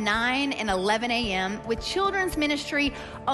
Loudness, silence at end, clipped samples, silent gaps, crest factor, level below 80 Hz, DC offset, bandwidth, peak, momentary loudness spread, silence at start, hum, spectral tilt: -26 LUFS; 0 s; under 0.1%; none; 14 dB; -46 dBFS; under 0.1%; 12.5 kHz; -12 dBFS; 5 LU; 0 s; none; -3.5 dB/octave